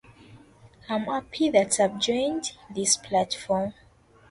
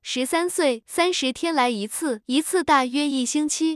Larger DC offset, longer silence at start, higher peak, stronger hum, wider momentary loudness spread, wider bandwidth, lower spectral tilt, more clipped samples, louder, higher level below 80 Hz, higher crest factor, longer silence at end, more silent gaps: neither; first, 0.3 s vs 0.05 s; about the same, -6 dBFS vs -6 dBFS; neither; first, 10 LU vs 4 LU; about the same, 11.5 kHz vs 12 kHz; about the same, -3 dB/octave vs -2 dB/octave; neither; second, -25 LUFS vs -22 LUFS; about the same, -60 dBFS vs -62 dBFS; about the same, 20 dB vs 16 dB; first, 0.6 s vs 0 s; neither